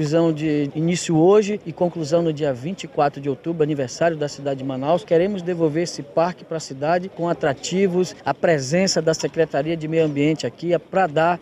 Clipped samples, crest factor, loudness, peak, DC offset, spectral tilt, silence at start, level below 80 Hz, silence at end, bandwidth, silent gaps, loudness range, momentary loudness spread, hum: under 0.1%; 14 dB; -21 LUFS; -6 dBFS; under 0.1%; -5.5 dB/octave; 0 s; -58 dBFS; 0 s; 12 kHz; none; 2 LU; 7 LU; none